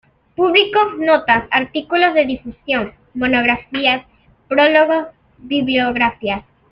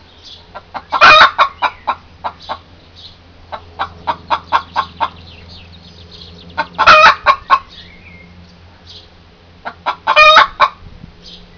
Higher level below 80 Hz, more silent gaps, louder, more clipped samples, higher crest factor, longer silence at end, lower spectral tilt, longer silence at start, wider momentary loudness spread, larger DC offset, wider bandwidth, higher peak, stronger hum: second, -48 dBFS vs -42 dBFS; neither; second, -16 LUFS vs -10 LUFS; second, under 0.1% vs 1%; about the same, 16 dB vs 14 dB; second, 0.3 s vs 0.85 s; first, -7 dB/octave vs -2 dB/octave; second, 0.4 s vs 0.55 s; second, 11 LU vs 25 LU; neither; about the same, 5.6 kHz vs 5.4 kHz; about the same, 0 dBFS vs 0 dBFS; neither